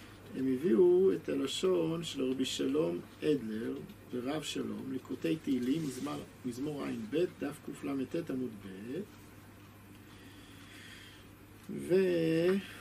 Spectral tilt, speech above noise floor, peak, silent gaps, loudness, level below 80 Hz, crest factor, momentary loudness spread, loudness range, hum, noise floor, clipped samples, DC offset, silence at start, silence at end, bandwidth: -5.5 dB/octave; 21 dB; -18 dBFS; none; -34 LUFS; -66 dBFS; 18 dB; 23 LU; 12 LU; none; -54 dBFS; under 0.1%; under 0.1%; 0 s; 0 s; 15 kHz